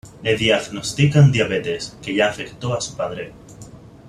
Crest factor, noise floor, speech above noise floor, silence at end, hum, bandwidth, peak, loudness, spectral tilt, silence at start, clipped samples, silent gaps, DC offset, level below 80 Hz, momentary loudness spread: 16 dB; -41 dBFS; 22 dB; 0.1 s; none; 11.5 kHz; -4 dBFS; -19 LUFS; -5.5 dB/octave; 0.05 s; under 0.1%; none; under 0.1%; -48 dBFS; 13 LU